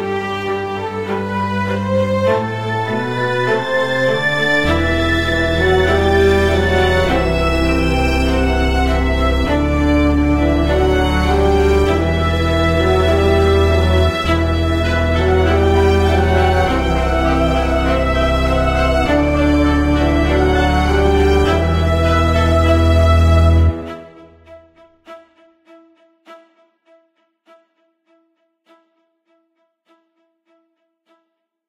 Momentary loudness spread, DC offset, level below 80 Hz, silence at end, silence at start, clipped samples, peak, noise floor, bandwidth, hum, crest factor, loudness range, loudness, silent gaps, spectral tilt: 6 LU; under 0.1%; -22 dBFS; 5.3 s; 0 s; under 0.1%; -2 dBFS; -69 dBFS; 13.5 kHz; none; 14 dB; 3 LU; -15 LUFS; none; -6.5 dB/octave